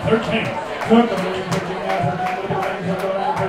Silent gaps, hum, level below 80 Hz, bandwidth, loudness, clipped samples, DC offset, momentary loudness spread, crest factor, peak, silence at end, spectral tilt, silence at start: none; none; -48 dBFS; 15.5 kHz; -20 LUFS; under 0.1%; under 0.1%; 7 LU; 18 dB; -2 dBFS; 0 s; -6 dB/octave; 0 s